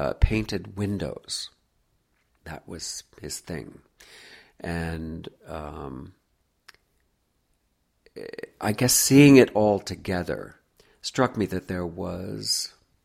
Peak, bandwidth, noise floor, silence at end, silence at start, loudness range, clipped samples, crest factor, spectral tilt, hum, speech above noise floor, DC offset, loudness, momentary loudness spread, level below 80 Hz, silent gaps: -2 dBFS; 16 kHz; -71 dBFS; 0.35 s; 0 s; 18 LU; under 0.1%; 24 dB; -4.5 dB/octave; none; 47 dB; under 0.1%; -24 LUFS; 23 LU; -40 dBFS; none